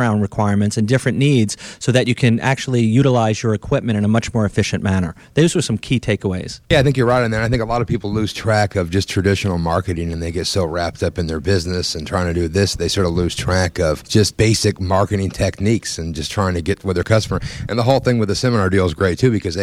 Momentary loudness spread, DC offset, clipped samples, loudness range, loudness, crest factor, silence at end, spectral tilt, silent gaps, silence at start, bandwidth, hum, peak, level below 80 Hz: 6 LU; under 0.1%; under 0.1%; 3 LU; -18 LUFS; 16 dB; 0 s; -5.5 dB/octave; none; 0 s; 14.5 kHz; none; 0 dBFS; -36 dBFS